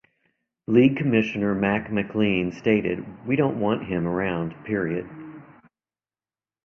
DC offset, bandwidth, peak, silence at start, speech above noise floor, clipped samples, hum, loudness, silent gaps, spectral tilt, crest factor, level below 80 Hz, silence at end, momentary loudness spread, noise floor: under 0.1%; 6.6 kHz; -6 dBFS; 0.7 s; over 67 dB; under 0.1%; none; -24 LUFS; none; -8.5 dB/octave; 20 dB; -54 dBFS; 1.2 s; 13 LU; under -90 dBFS